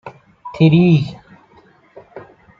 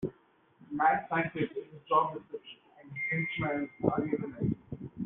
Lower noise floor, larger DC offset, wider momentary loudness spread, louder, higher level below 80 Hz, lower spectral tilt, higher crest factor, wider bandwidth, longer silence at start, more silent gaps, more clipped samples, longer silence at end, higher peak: second, -50 dBFS vs -65 dBFS; neither; first, 24 LU vs 17 LU; first, -14 LUFS vs -32 LUFS; first, -52 dBFS vs -62 dBFS; first, -9 dB/octave vs -5.5 dB/octave; second, 16 dB vs 24 dB; first, 5.4 kHz vs 3.9 kHz; about the same, 0.05 s vs 0 s; neither; neither; first, 0.4 s vs 0 s; first, -2 dBFS vs -10 dBFS